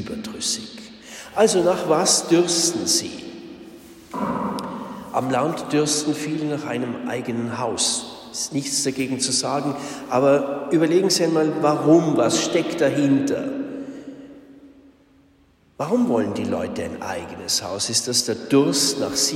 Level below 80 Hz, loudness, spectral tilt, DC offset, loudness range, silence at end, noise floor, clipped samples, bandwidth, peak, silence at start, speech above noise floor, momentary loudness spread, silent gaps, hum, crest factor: -60 dBFS; -21 LUFS; -3.5 dB/octave; under 0.1%; 7 LU; 0 s; -57 dBFS; under 0.1%; 16 kHz; -4 dBFS; 0 s; 36 dB; 15 LU; none; none; 18 dB